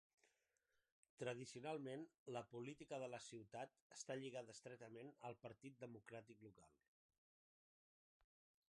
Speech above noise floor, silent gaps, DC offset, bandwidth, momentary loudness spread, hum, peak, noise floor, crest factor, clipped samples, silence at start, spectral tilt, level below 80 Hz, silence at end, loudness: 34 dB; 0.92-1.03 s, 1.09-1.17 s, 2.18-2.26 s, 3.82-3.90 s; under 0.1%; 11 kHz; 9 LU; none; -36 dBFS; -89 dBFS; 20 dB; under 0.1%; 0.25 s; -4.5 dB/octave; under -90 dBFS; 2.05 s; -55 LUFS